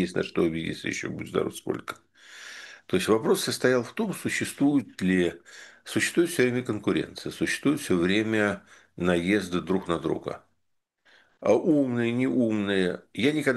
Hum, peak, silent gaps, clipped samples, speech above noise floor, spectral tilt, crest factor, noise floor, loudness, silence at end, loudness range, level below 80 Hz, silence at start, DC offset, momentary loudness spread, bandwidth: none; -8 dBFS; none; under 0.1%; 51 dB; -5 dB/octave; 18 dB; -77 dBFS; -26 LUFS; 0 s; 3 LU; -60 dBFS; 0 s; under 0.1%; 14 LU; 12.5 kHz